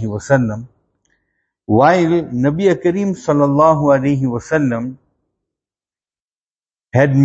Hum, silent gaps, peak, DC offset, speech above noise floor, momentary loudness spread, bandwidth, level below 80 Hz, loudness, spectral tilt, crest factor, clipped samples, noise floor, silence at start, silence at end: none; 6.22-6.28 s, 6.36-6.48 s; 0 dBFS; under 0.1%; over 76 dB; 8 LU; 8.2 kHz; -50 dBFS; -15 LUFS; -8 dB/octave; 16 dB; under 0.1%; under -90 dBFS; 0 s; 0 s